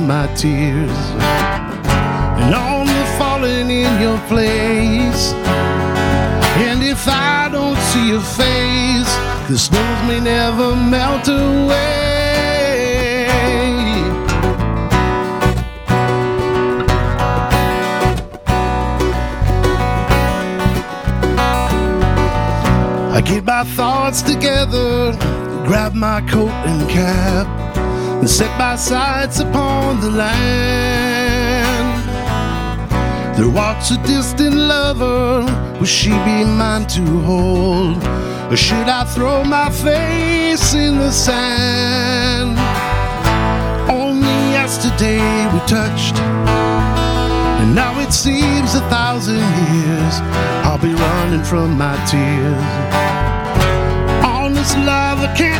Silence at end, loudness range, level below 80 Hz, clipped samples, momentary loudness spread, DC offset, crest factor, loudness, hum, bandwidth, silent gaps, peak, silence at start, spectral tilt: 0 s; 2 LU; -24 dBFS; under 0.1%; 4 LU; under 0.1%; 14 dB; -15 LUFS; none; 19.5 kHz; none; 0 dBFS; 0 s; -5 dB/octave